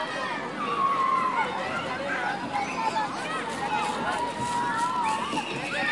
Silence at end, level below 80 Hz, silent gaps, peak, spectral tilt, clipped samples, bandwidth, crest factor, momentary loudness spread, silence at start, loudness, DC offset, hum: 0 s; -64 dBFS; none; -14 dBFS; -3.5 dB/octave; under 0.1%; 11.5 kHz; 14 dB; 6 LU; 0 s; -28 LUFS; under 0.1%; none